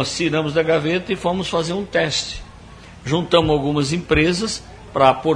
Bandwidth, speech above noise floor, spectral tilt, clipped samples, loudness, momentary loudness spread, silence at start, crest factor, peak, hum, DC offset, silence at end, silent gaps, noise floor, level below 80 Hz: 10.5 kHz; 22 dB; -5 dB/octave; under 0.1%; -19 LUFS; 10 LU; 0 s; 18 dB; 0 dBFS; none; under 0.1%; 0 s; none; -40 dBFS; -40 dBFS